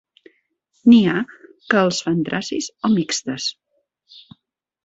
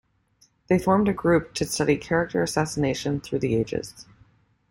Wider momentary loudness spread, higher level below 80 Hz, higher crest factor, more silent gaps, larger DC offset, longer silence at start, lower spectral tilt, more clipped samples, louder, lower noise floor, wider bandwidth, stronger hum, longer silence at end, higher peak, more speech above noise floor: first, 12 LU vs 7 LU; second, -62 dBFS vs -50 dBFS; about the same, 18 dB vs 18 dB; neither; neither; first, 0.85 s vs 0.7 s; about the same, -4.5 dB/octave vs -5.5 dB/octave; neither; first, -19 LUFS vs -24 LUFS; first, -69 dBFS vs -63 dBFS; second, 8 kHz vs 16.5 kHz; neither; first, 1.35 s vs 0.7 s; first, -2 dBFS vs -8 dBFS; first, 51 dB vs 40 dB